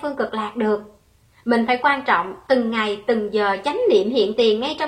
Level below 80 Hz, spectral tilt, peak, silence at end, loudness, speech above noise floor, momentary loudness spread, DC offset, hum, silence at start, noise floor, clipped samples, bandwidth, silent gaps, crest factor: -58 dBFS; -5 dB/octave; -4 dBFS; 0 s; -20 LUFS; 36 dB; 7 LU; under 0.1%; none; 0 s; -55 dBFS; under 0.1%; 10 kHz; none; 16 dB